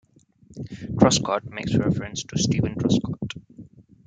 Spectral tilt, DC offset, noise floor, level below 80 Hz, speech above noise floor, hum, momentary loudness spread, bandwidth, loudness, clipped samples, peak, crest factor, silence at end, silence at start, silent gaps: -5 dB/octave; under 0.1%; -54 dBFS; -48 dBFS; 32 dB; none; 18 LU; 9.6 kHz; -23 LUFS; under 0.1%; -2 dBFS; 22 dB; 0.4 s; 0.5 s; none